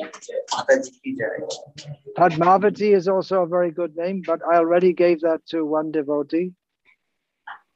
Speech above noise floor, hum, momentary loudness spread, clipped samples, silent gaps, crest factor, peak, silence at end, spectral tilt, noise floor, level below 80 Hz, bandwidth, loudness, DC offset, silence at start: 57 dB; none; 15 LU; under 0.1%; none; 16 dB; -6 dBFS; 0.2 s; -6 dB/octave; -78 dBFS; -70 dBFS; 8.4 kHz; -21 LUFS; under 0.1%; 0 s